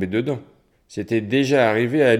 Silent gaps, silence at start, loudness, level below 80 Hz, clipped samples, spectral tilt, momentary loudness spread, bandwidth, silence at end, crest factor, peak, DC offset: none; 0 s; -20 LUFS; -64 dBFS; under 0.1%; -6.5 dB/octave; 15 LU; 14 kHz; 0 s; 16 dB; -4 dBFS; under 0.1%